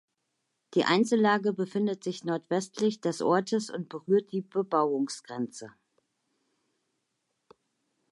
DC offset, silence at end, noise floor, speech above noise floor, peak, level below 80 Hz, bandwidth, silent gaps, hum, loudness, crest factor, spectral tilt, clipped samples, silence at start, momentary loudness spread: under 0.1%; 2.4 s; -80 dBFS; 52 dB; -12 dBFS; -82 dBFS; 11.5 kHz; none; none; -29 LUFS; 18 dB; -5 dB/octave; under 0.1%; 0.7 s; 12 LU